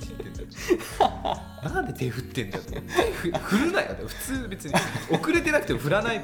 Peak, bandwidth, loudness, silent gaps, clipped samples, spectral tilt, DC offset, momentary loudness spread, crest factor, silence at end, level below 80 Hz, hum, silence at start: -6 dBFS; 19.5 kHz; -27 LUFS; none; under 0.1%; -5 dB/octave; under 0.1%; 10 LU; 20 dB; 0 s; -42 dBFS; none; 0 s